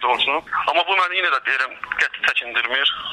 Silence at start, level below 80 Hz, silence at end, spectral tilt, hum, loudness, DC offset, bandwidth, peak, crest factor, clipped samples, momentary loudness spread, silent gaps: 0 s; -60 dBFS; 0 s; -1 dB/octave; none; -19 LUFS; under 0.1%; 14.5 kHz; -6 dBFS; 16 dB; under 0.1%; 4 LU; none